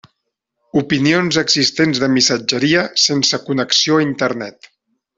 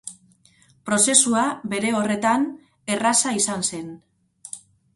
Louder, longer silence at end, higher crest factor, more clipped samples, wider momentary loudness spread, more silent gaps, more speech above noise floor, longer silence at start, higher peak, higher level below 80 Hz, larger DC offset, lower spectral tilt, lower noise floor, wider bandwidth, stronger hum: first, -15 LUFS vs -20 LUFS; first, 0.7 s vs 0.35 s; second, 16 dB vs 22 dB; neither; second, 7 LU vs 22 LU; neither; first, 59 dB vs 36 dB; first, 0.75 s vs 0.05 s; about the same, -2 dBFS vs 0 dBFS; first, -56 dBFS vs -64 dBFS; neither; about the same, -3.5 dB/octave vs -2.5 dB/octave; first, -75 dBFS vs -57 dBFS; second, 7.8 kHz vs 12 kHz; neither